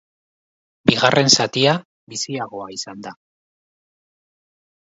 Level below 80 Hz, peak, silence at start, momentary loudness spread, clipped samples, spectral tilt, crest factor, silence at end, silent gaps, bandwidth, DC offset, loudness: -56 dBFS; 0 dBFS; 0.85 s; 18 LU; under 0.1%; -3.5 dB/octave; 22 dB; 1.75 s; 1.85-2.07 s; 8 kHz; under 0.1%; -17 LUFS